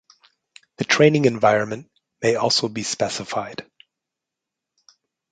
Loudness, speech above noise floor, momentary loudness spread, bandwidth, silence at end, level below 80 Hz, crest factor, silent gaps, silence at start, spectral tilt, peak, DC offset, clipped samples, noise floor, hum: -20 LUFS; 65 dB; 15 LU; 9.4 kHz; 1.7 s; -62 dBFS; 20 dB; none; 0.8 s; -4 dB/octave; -2 dBFS; under 0.1%; under 0.1%; -85 dBFS; none